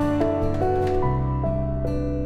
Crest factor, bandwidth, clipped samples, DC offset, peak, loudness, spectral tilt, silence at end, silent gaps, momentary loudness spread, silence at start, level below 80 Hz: 12 dB; 8.6 kHz; under 0.1%; under 0.1%; -10 dBFS; -24 LUFS; -9 dB/octave; 0 s; none; 4 LU; 0 s; -30 dBFS